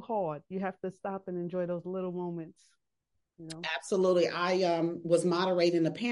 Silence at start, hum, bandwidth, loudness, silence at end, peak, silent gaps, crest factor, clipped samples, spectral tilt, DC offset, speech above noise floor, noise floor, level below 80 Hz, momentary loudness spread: 0 s; none; 11.5 kHz; -31 LUFS; 0 s; -14 dBFS; none; 18 dB; under 0.1%; -5.5 dB/octave; under 0.1%; 52 dB; -83 dBFS; -78 dBFS; 12 LU